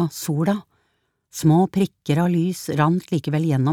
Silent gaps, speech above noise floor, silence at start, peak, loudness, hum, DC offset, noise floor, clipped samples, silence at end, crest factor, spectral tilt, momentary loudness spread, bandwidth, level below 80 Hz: none; 50 dB; 0 s; -2 dBFS; -21 LUFS; none; under 0.1%; -70 dBFS; under 0.1%; 0 s; 18 dB; -7 dB/octave; 6 LU; 17.5 kHz; -60 dBFS